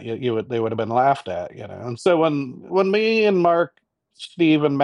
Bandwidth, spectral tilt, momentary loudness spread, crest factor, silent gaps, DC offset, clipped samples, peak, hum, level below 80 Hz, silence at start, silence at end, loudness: 11 kHz; -7 dB/octave; 14 LU; 14 dB; none; under 0.1%; under 0.1%; -6 dBFS; none; -66 dBFS; 0 s; 0 s; -20 LUFS